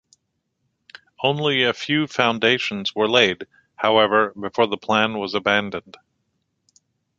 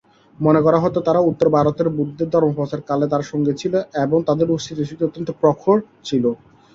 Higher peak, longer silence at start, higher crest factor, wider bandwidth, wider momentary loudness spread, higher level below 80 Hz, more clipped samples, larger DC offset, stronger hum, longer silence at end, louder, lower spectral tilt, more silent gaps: about the same, -2 dBFS vs -2 dBFS; first, 1.2 s vs 0.4 s; first, 22 dB vs 16 dB; about the same, 7.8 kHz vs 7.6 kHz; about the same, 8 LU vs 8 LU; second, -62 dBFS vs -54 dBFS; neither; neither; neither; first, 1.4 s vs 0.4 s; about the same, -20 LUFS vs -19 LUFS; second, -4.5 dB/octave vs -7.5 dB/octave; neither